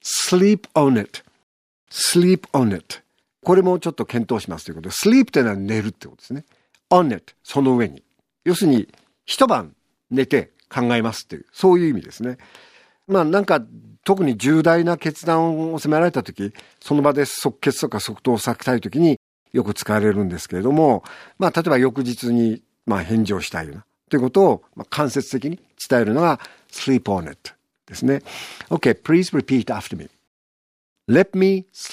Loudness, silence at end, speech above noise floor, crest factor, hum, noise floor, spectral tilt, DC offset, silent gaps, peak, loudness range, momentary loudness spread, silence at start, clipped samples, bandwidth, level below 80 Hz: -19 LUFS; 0 s; over 71 dB; 20 dB; none; under -90 dBFS; -5.5 dB/octave; under 0.1%; 1.43-1.87 s, 19.17-19.46 s, 30.27-30.96 s; 0 dBFS; 3 LU; 15 LU; 0.05 s; under 0.1%; 15.5 kHz; -60 dBFS